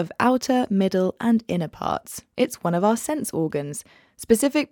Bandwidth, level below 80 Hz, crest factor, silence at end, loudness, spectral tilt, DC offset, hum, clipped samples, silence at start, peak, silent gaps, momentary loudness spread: 18 kHz; -58 dBFS; 18 dB; 0.05 s; -23 LUFS; -5.5 dB/octave; under 0.1%; none; under 0.1%; 0 s; -4 dBFS; none; 10 LU